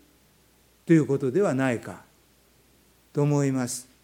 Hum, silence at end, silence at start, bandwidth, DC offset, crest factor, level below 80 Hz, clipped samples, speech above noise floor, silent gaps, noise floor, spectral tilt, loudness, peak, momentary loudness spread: none; 0.2 s; 0.85 s; 16.5 kHz; under 0.1%; 20 dB; -68 dBFS; under 0.1%; 37 dB; none; -61 dBFS; -6.5 dB/octave; -25 LUFS; -8 dBFS; 18 LU